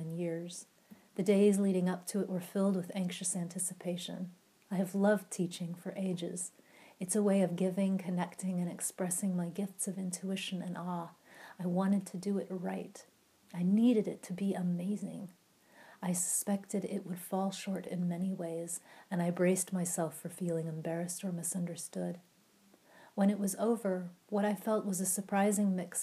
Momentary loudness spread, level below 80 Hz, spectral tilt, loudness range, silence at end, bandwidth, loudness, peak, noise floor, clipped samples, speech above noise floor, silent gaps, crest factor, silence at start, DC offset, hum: 11 LU; -88 dBFS; -5.5 dB/octave; 4 LU; 0 s; 15 kHz; -35 LUFS; -18 dBFS; -66 dBFS; under 0.1%; 32 dB; none; 18 dB; 0 s; under 0.1%; none